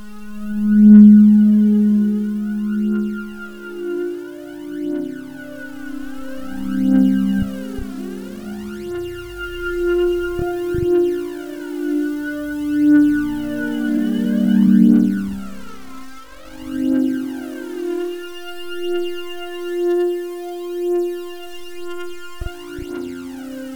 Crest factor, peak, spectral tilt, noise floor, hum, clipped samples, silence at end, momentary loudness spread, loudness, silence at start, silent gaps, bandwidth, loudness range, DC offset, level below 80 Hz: 18 dB; 0 dBFS; -8 dB/octave; -39 dBFS; none; under 0.1%; 0 s; 19 LU; -17 LUFS; 0 s; none; 19 kHz; 10 LU; under 0.1%; -42 dBFS